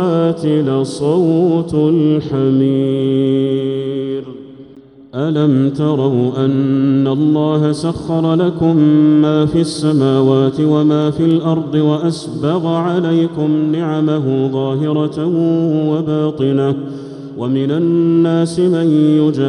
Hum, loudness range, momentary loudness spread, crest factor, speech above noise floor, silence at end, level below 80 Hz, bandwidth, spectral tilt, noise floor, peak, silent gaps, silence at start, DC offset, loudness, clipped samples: none; 4 LU; 7 LU; 12 dB; 26 dB; 0 s; -50 dBFS; 11 kHz; -8 dB/octave; -40 dBFS; -2 dBFS; none; 0 s; under 0.1%; -14 LUFS; under 0.1%